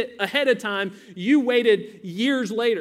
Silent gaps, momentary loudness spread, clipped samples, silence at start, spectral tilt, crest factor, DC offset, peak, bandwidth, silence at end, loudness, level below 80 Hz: none; 10 LU; under 0.1%; 0 s; -5 dB/octave; 18 dB; under 0.1%; -6 dBFS; 15 kHz; 0 s; -22 LUFS; -72 dBFS